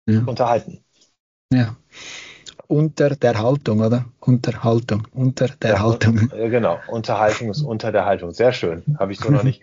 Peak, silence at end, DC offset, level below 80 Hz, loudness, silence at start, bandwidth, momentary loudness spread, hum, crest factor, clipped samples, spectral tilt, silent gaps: -4 dBFS; 0.1 s; under 0.1%; -54 dBFS; -19 LUFS; 0.05 s; 7.6 kHz; 8 LU; none; 16 dB; under 0.1%; -7 dB/octave; 1.20-1.49 s